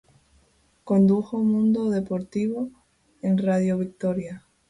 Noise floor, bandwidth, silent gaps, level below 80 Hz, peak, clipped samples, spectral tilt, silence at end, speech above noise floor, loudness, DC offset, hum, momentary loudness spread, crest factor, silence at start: -62 dBFS; 10.5 kHz; none; -60 dBFS; -10 dBFS; under 0.1%; -9 dB/octave; 0.3 s; 40 dB; -24 LUFS; under 0.1%; none; 11 LU; 14 dB; 0.85 s